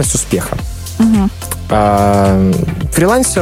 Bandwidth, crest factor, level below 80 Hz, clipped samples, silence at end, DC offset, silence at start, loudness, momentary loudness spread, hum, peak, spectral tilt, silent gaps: 16.5 kHz; 12 dB; -26 dBFS; under 0.1%; 0 s; under 0.1%; 0 s; -13 LUFS; 10 LU; none; 0 dBFS; -5.5 dB/octave; none